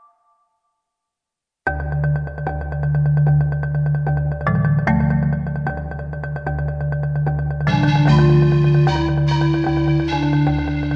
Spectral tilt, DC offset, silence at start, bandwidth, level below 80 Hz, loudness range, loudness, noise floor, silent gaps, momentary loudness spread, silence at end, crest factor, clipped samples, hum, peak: -8.5 dB/octave; under 0.1%; 1.65 s; 6.4 kHz; -32 dBFS; 5 LU; -19 LUFS; -84 dBFS; none; 11 LU; 0 s; 14 dB; under 0.1%; none; -4 dBFS